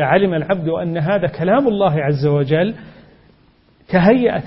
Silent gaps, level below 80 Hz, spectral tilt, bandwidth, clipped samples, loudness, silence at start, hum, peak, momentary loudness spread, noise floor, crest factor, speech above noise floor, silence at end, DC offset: none; -48 dBFS; -12.5 dB/octave; 5.8 kHz; under 0.1%; -16 LUFS; 0 s; none; 0 dBFS; 6 LU; -53 dBFS; 16 dB; 37 dB; 0 s; under 0.1%